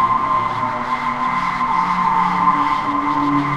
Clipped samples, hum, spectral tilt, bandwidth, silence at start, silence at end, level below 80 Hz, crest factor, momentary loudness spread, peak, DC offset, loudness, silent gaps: under 0.1%; none; -6 dB/octave; 10.5 kHz; 0 s; 0 s; -44 dBFS; 16 dB; 5 LU; -2 dBFS; under 0.1%; -18 LUFS; none